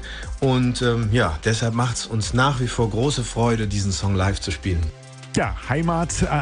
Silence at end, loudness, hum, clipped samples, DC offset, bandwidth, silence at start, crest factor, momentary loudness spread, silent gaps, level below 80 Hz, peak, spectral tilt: 0 s; -22 LUFS; none; under 0.1%; under 0.1%; 10 kHz; 0 s; 16 dB; 5 LU; none; -34 dBFS; -6 dBFS; -5 dB/octave